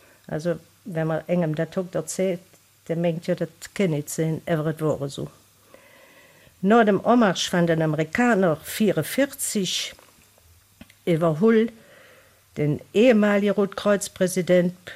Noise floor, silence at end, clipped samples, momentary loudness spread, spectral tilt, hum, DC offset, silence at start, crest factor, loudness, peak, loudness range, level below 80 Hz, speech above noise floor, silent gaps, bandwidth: -56 dBFS; 0 s; under 0.1%; 11 LU; -5.5 dB/octave; none; under 0.1%; 0.3 s; 16 dB; -23 LUFS; -6 dBFS; 6 LU; -62 dBFS; 34 dB; none; 15.5 kHz